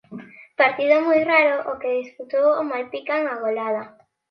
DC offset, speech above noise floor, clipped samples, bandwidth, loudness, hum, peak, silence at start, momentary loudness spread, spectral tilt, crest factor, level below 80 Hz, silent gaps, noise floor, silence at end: under 0.1%; 19 dB; under 0.1%; 6.2 kHz; -21 LUFS; none; -4 dBFS; 0.1 s; 12 LU; -6 dB/octave; 18 dB; -70 dBFS; none; -40 dBFS; 0.4 s